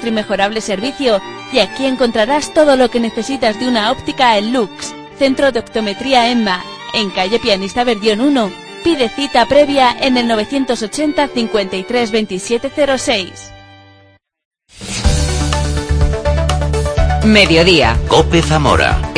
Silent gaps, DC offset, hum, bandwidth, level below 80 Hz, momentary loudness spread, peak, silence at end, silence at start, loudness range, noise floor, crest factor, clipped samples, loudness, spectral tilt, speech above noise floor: 14.45-14.51 s; under 0.1%; none; 10.5 kHz; -24 dBFS; 8 LU; 0 dBFS; 0 s; 0 s; 6 LU; -48 dBFS; 14 dB; under 0.1%; -14 LUFS; -5 dB/octave; 35 dB